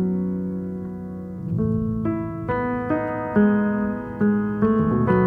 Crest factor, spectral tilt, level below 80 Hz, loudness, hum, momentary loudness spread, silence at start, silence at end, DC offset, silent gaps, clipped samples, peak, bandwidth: 16 dB; -11 dB/octave; -44 dBFS; -23 LUFS; none; 11 LU; 0 s; 0 s; under 0.1%; none; under 0.1%; -6 dBFS; 3.4 kHz